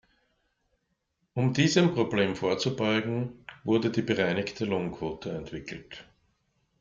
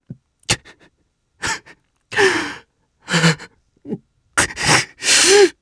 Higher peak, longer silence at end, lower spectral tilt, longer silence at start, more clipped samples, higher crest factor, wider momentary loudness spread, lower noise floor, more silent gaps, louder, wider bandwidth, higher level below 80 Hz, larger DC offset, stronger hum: second, -8 dBFS vs 0 dBFS; first, 0.8 s vs 0.1 s; first, -5.5 dB/octave vs -2.5 dB/octave; first, 1.35 s vs 0.1 s; neither; about the same, 20 dB vs 18 dB; second, 15 LU vs 21 LU; first, -77 dBFS vs -66 dBFS; neither; second, -28 LUFS vs -16 LUFS; second, 7.6 kHz vs 11 kHz; second, -60 dBFS vs -48 dBFS; neither; neither